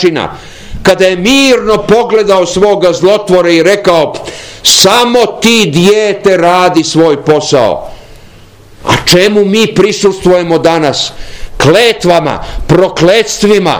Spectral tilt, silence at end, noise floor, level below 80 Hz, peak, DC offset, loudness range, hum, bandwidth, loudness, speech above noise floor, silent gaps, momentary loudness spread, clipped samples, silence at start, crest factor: -4 dB/octave; 0 s; -35 dBFS; -30 dBFS; 0 dBFS; under 0.1%; 2 LU; none; over 20 kHz; -7 LUFS; 28 dB; none; 10 LU; 6%; 0 s; 8 dB